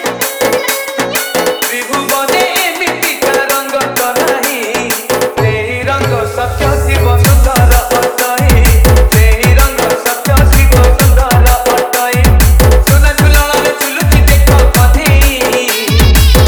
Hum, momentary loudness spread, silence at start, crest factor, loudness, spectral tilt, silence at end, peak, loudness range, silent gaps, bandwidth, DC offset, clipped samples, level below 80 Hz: none; 6 LU; 0 s; 8 dB; -9 LUFS; -4.5 dB/octave; 0 s; 0 dBFS; 4 LU; none; over 20 kHz; under 0.1%; 0.6%; -12 dBFS